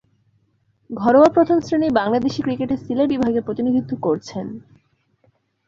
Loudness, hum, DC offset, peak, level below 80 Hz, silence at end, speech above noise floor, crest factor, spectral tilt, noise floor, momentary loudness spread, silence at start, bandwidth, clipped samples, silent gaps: -19 LUFS; none; under 0.1%; -2 dBFS; -54 dBFS; 1.1 s; 45 dB; 18 dB; -7 dB/octave; -64 dBFS; 17 LU; 0.9 s; 7.6 kHz; under 0.1%; none